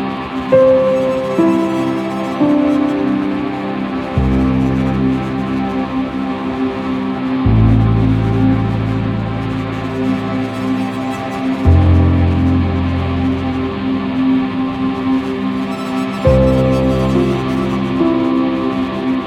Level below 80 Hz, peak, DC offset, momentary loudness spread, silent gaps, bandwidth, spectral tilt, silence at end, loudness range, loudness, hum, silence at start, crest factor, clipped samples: -28 dBFS; 0 dBFS; under 0.1%; 8 LU; none; 10.5 kHz; -8.5 dB/octave; 0 s; 3 LU; -16 LUFS; none; 0 s; 14 dB; under 0.1%